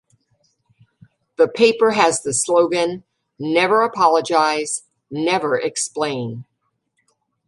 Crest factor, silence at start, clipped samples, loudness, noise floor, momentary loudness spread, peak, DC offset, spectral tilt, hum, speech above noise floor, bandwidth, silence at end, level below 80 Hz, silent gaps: 18 dB; 1.4 s; under 0.1%; -18 LUFS; -72 dBFS; 14 LU; -2 dBFS; under 0.1%; -3 dB/octave; none; 55 dB; 11.5 kHz; 1.05 s; -66 dBFS; none